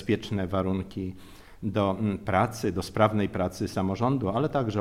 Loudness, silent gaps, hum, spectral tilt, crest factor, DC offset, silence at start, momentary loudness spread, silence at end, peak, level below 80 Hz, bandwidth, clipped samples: -28 LUFS; none; none; -7 dB/octave; 20 dB; under 0.1%; 0 s; 10 LU; 0 s; -8 dBFS; -52 dBFS; 15.5 kHz; under 0.1%